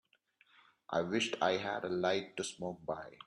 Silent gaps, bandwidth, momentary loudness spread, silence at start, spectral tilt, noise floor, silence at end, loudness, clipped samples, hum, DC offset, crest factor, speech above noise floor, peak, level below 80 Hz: none; 11 kHz; 9 LU; 0.9 s; -4 dB/octave; -71 dBFS; 0.1 s; -36 LUFS; under 0.1%; none; under 0.1%; 20 dB; 35 dB; -18 dBFS; -76 dBFS